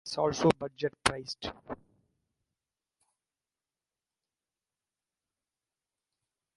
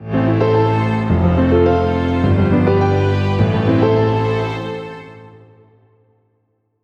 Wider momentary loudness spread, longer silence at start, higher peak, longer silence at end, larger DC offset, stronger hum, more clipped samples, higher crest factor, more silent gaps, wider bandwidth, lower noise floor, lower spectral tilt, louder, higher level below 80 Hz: first, 18 LU vs 9 LU; about the same, 0.05 s vs 0 s; second, -6 dBFS vs -2 dBFS; first, 4.8 s vs 1.55 s; neither; neither; neither; first, 32 dB vs 14 dB; neither; first, 11.5 kHz vs 7 kHz; first, under -90 dBFS vs -65 dBFS; second, -4.5 dB/octave vs -9 dB/octave; second, -31 LUFS vs -15 LUFS; second, -62 dBFS vs -34 dBFS